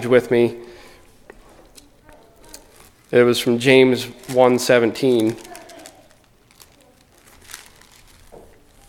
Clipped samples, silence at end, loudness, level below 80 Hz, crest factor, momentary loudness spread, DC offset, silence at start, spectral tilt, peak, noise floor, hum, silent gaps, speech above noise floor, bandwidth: under 0.1%; 1.3 s; -17 LUFS; -54 dBFS; 20 dB; 25 LU; under 0.1%; 0 s; -5 dB/octave; 0 dBFS; -53 dBFS; none; none; 37 dB; 17 kHz